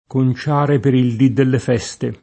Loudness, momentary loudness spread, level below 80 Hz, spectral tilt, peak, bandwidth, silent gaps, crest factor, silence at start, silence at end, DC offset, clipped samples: -16 LUFS; 6 LU; -50 dBFS; -7.5 dB/octave; 0 dBFS; 8.8 kHz; none; 14 dB; 0.1 s; 0.1 s; under 0.1%; under 0.1%